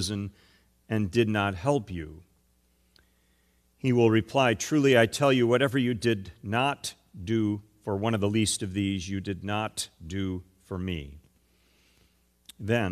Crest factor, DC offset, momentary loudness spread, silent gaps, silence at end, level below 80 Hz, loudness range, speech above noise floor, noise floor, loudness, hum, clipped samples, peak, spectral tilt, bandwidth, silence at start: 20 dB; under 0.1%; 15 LU; none; 0 s; -56 dBFS; 10 LU; 41 dB; -67 dBFS; -27 LUFS; none; under 0.1%; -8 dBFS; -5 dB/octave; 14.5 kHz; 0 s